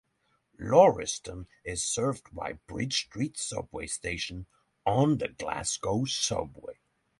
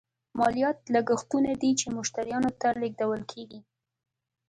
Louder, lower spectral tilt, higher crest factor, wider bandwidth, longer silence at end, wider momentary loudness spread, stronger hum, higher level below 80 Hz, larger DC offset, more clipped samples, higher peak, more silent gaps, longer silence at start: about the same, -29 LUFS vs -28 LUFS; about the same, -4 dB/octave vs -4 dB/octave; first, 24 dB vs 16 dB; about the same, 11.5 kHz vs 11 kHz; second, 0.45 s vs 0.9 s; first, 18 LU vs 12 LU; neither; first, -54 dBFS vs -62 dBFS; neither; neither; first, -6 dBFS vs -12 dBFS; neither; first, 0.6 s vs 0.35 s